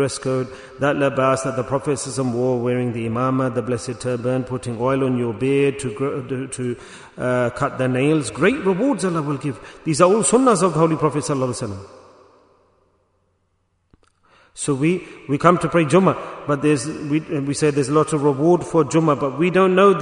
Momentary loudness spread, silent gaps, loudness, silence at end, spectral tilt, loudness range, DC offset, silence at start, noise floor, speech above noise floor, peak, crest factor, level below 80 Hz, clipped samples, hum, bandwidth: 11 LU; none; -20 LUFS; 0 s; -6 dB/octave; 7 LU; under 0.1%; 0 s; -67 dBFS; 48 dB; 0 dBFS; 20 dB; -54 dBFS; under 0.1%; none; 11 kHz